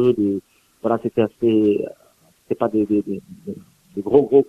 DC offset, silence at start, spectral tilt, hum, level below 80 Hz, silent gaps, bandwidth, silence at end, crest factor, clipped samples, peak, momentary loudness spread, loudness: under 0.1%; 0 s; -9 dB/octave; none; -60 dBFS; none; 6.6 kHz; 0.05 s; 18 dB; under 0.1%; -2 dBFS; 17 LU; -20 LUFS